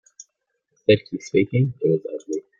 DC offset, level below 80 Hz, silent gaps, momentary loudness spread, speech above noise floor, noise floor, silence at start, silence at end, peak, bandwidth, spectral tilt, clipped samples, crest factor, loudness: under 0.1%; -60 dBFS; none; 8 LU; 54 dB; -75 dBFS; 0.9 s; 0.2 s; -4 dBFS; 7.6 kHz; -7 dB/octave; under 0.1%; 18 dB; -22 LUFS